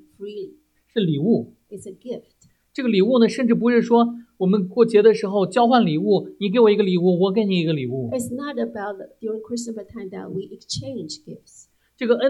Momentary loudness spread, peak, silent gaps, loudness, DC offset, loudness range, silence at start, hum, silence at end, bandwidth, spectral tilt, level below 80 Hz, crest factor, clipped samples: 18 LU; -2 dBFS; none; -20 LUFS; under 0.1%; 12 LU; 0.2 s; none; 0 s; 12.5 kHz; -6.5 dB/octave; -64 dBFS; 18 dB; under 0.1%